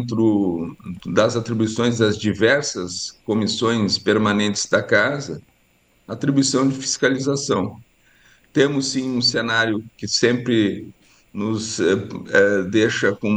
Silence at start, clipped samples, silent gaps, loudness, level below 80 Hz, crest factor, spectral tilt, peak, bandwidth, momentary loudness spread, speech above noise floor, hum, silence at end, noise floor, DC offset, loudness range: 0 s; under 0.1%; none; -20 LUFS; -58 dBFS; 18 dB; -4 dB/octave; -2 dBFS; 10 kHz; 10 LU; 40 dB; none; 0 s; -60 dBFS; under 0.1%; 2 LU